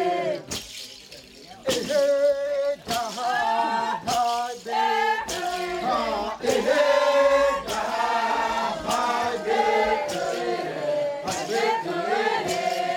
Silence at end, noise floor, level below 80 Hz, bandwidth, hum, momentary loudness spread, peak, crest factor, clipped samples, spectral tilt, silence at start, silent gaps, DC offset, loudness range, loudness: 0 s; -45 dBFS; -56 dBFS; 18 kHz; none; 8 LU; -8 dBFS; 16 dB; under 0.1%; -3 dB/octave; 0 s; none; under 0.1%; 3 LU; -24 LUFS